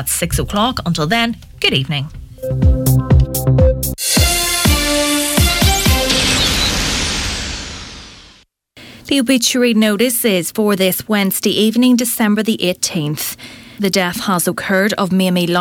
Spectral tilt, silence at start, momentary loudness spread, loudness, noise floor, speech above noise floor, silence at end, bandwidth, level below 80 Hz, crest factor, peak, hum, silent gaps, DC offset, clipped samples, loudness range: -4 dB/octave; 0 s; 10 LU; -14 LUFS; -48 dBFS; 33 dB; 0 s; 19 kHz; -24 dBFS; 14 dB; -2 dBFS; none; none; under 0.1%; under 0.1%; 4 LU